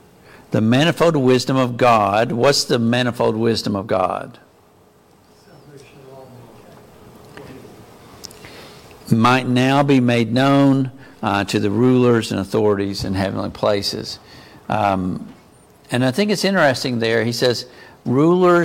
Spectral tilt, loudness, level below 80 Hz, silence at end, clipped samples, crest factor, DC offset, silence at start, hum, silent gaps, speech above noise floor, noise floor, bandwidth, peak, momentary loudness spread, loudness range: -5.5 dB/octave; -17 LUFS; -52 dBFS; 0 s; under 0.1%; 18 dB; under 0.1%; 0.5 s; none; none; 35 dB; -51 dBFS; 16.5 kHz; -2 dBFS; 17 LU; 7 LU